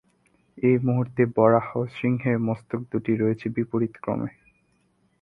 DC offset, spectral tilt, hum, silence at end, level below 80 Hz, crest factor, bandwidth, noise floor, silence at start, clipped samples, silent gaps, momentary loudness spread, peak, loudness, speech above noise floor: under 0.1%; -10.5 dB/octave; none; 0.95 s; -60 dBFS; 22 dB; 4.9 kHz; -66 dBFS; 0.55 s; under 0.1%; none; 10 LU; -4 dBFS; -24 LUFS; 43 dB